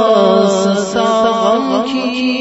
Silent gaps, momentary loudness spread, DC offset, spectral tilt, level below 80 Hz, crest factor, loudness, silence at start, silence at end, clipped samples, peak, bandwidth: none; 6 LU; under 0.1%; -5 dB/octave; -52 dBFS; 12 dB; -13 LUFS; 0 s; 0 s; under 0.1%; 0 dBFS; 8 kHz